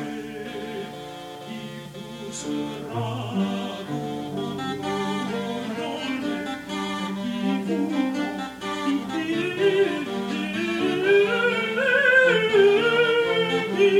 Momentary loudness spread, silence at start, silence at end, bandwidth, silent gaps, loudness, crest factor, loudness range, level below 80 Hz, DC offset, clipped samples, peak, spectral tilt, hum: 16 LU; 0 s; 0 s; 16 kHz; none; -24 LUFS; 18 dB; 11 LU; -62 dBFS; under 0.1%; under 0.1%; -6 dBFS; -5 dB/octave; none